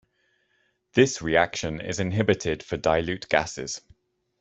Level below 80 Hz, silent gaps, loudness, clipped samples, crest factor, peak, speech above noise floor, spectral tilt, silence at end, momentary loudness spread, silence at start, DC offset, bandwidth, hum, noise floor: -52 dBFS; none; -25 LUFS; under 0.1%; 22 dB; -4 dBFS; 46 dB; -4.5 dB/octave; 0.6 s; 10 LU; 0.95 s; under 0.1%; 8.2 kHz; none; -70 dBFS